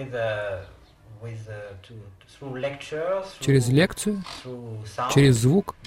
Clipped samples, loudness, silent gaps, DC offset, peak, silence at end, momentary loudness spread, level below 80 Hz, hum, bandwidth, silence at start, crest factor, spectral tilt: under 0.1%; -23 LUFS; none; under 0.1%; -6 dBFS; 0 s; 22 LU; -50 dBFS; none; 16 kHz; 0 s; 18 dB; -6 dB/octave